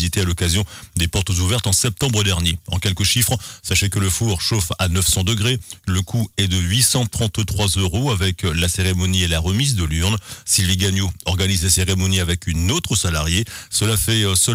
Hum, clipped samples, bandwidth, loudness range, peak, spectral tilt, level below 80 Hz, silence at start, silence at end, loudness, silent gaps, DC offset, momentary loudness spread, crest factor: none; under 0.1%; 16 kHz; 1 LU; -2 dBFS; -3.5 dB/octave; -32 dBFS; 0 s; 0 s; -18 LUFS; none; under 0.1%; 6 LU; 16 dB